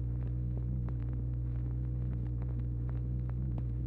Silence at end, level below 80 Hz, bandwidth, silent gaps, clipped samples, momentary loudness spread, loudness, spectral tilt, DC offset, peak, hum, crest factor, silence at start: 0 s; -38 dBFS; 2.6 kHz; none; under 0.1%; 1 LU; -37 LUFS; -12 dB/octave; under 0.1%; -26 dBFS; none; 8 dB; 0 s